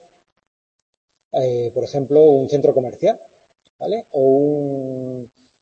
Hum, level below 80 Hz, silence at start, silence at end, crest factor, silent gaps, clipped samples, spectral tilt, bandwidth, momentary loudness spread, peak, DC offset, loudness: none; -64 dBFS; 1.35 s; 0.35 s; 16 dB; 3.70-3.79 s; under 0.1%; -8 dB/octave; 7.2 kHz; 15 LU; -2 dBFS; under 0.1%; -18 LUFS